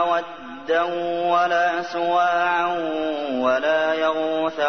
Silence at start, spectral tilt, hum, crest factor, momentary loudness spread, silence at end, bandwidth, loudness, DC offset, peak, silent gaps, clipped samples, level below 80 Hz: 0 s; -4.5 dB/octave; none; 14 dB; 6 LU; 0 s; 6.4 kHz; -21 LUFS; 0.3%; -8 dBFS; none; under 0.1%; -64 dBFS